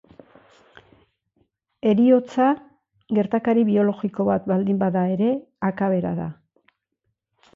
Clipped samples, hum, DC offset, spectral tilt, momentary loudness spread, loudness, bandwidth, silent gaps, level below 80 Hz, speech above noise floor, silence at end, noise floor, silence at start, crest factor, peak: under 0.1%; none; under 0.1%; -9.5 dB/octave; 9 LU; -21 LUFS; 7.2 kHz; none; -62 dBFS; 57 dB; 1.25 s; -77 dBFS; 1.85 s; 16 dB; -6 dBFS